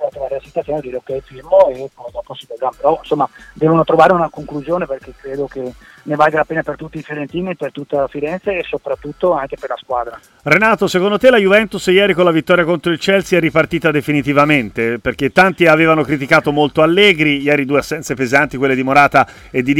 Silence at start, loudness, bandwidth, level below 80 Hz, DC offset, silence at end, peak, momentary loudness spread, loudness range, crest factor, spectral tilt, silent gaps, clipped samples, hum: 0 s; -14 LUFS; 16.5 kHz; -46 dBFS; under 0.1%; 0 s; 0 dBFS; 15 LU; 8 LU; 14 dB; -5.5 dB/octave; none; under 0.1%; none